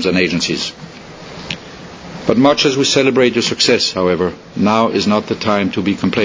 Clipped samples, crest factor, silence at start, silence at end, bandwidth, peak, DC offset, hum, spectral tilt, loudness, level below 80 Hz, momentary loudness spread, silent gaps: under 0.1%; 16 dB; 0 s; 0 s; 8 kHz; 0 dBFS; under 0.1%; none; -4 dB/octave; -14 LUFS; -46 dBFS; 20 LU; none